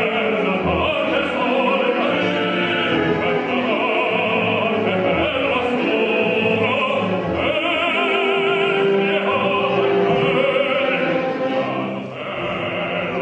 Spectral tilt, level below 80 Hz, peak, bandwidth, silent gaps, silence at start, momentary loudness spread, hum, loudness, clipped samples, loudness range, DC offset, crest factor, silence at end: -6.5 dB/octave; -48 dBFS; -6 dBFS; 8.8 kHz; none; 0 s; 5 LU; none; -19 LUFS; under 0.1%; 1 LU; under 0.1%; 14 dB; 0 s